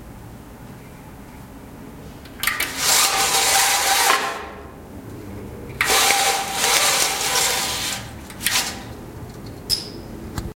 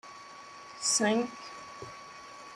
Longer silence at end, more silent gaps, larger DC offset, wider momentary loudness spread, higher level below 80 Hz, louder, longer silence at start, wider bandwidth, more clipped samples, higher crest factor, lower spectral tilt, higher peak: about the same, 0.05 s vs 0 s; neither; neither; first, 25 LU vs 21 LU; first, -44 dBFS vs -74 dBFS; first, -18 LUFS vs -29 LUFS; about the same, 0 s vs 0.05 s; first, 16.5 kHz vs 14.5 kHz; neither; about the same, 22 dB vs 22 dB; second, -0.5 dB/octave vs -2 dB/octave; first, 0 dBFS vs -14 dBFS